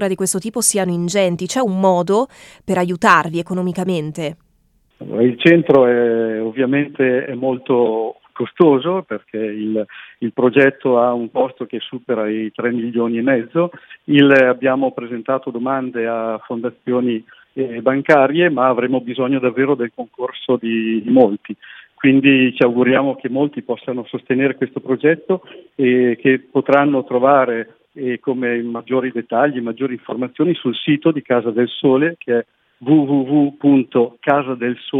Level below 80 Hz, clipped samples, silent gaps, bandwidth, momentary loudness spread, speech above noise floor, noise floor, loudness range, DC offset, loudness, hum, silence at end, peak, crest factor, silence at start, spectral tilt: -64 dBFS; under 0.1%; none; 13.5 kHz; 12 LU; 42 dB; -59 dBFS; 3 LU; under 0.1%; -17 LUFS; none; 0 s; 0 dBFS; 16 dB; 0 s; -5.5 dB/octave